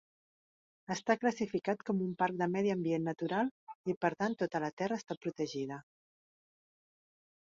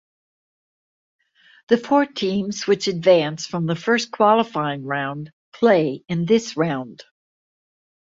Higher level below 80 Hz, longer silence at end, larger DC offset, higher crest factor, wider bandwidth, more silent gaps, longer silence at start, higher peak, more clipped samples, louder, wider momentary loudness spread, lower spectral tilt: second, -78 dBFS vs -64 dBFS; first, 1.75 s vs 1.25 s; neither; about the same, 22 dB vs 18 dB; about the same, 7.4 kHz vs 7.8 kHz; first, 3.51-3.67 s, 3.75-3.84 s, 3.97-4.01 s, 4.73-4.77 s, 5.17-5.21 s vs 5.33-5.52 s; second, 0.9 s vs 1.7 s; second, -14 dBFS vs -2 dBFS; neither; second, -35 LUFS vs -20 LUFS; about the same, 9 LU vs 9 LU; about the same, -5.5 dB/octave vs -5.5 dB/octave